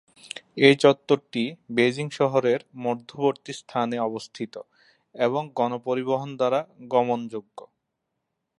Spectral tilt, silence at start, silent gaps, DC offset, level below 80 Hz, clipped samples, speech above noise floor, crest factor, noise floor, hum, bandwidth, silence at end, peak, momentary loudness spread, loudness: -5.5 dB/octave; 0.25 s; none; under 0.1%; -74 dBFS; under 0.1%; 56 dB; 24 dB; -80 dBFS; none; 11 kHz; 0.95 s; -2 dBFS; 16 LU; -24 LUFS